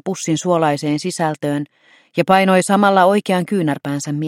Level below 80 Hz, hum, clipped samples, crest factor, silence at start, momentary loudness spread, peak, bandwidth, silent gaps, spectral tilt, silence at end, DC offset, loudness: -64 dBFS; none; under 0.1%; 16 dB; 0.05 s; 10 LU; 0 dBFS; 15.5 kHz; none; -5.5 dB/octave; 0 s; under 0.1%; -17 LUFS